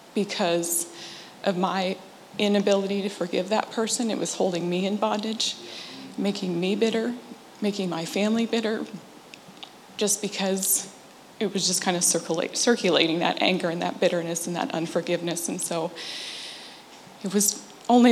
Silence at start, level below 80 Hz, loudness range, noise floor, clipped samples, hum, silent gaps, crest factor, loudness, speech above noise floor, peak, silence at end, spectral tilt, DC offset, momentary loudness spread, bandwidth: 0 s; -76 dBFS; 5 LU; -47 dBFS; under 0.1%; none; none; 24 dB; -25 LUFS; 21 dB; -2 dBFS; 0 s; -3.5 dB/octave; under 0.1%; 16 LU; 16 kHz